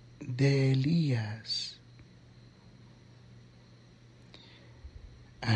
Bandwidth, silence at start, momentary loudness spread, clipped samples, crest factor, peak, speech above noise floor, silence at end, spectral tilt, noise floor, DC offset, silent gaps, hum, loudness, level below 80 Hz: 9.2 kHz; 0.2 s; 27 LU; under 0.1%; 18 dB; -14 dBFS; 28 dB; 0 s; -6.5 dB/octave; -56 dBFS; under 0.1%; none; none; -30 LUFS; -60 dBFS